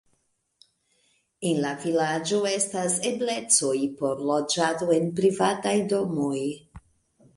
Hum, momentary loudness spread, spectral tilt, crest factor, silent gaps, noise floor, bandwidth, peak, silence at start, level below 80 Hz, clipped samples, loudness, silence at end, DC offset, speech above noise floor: none; 7 LU; -3.5 dB/octave; 20 dB; none; -72 dBFS; 11.5 kHz; -6 dBFS; 1.4 s; -64 dBFS; under 0.1%; -25 LUFS; 0.55 s; under 0.1%; 47 dB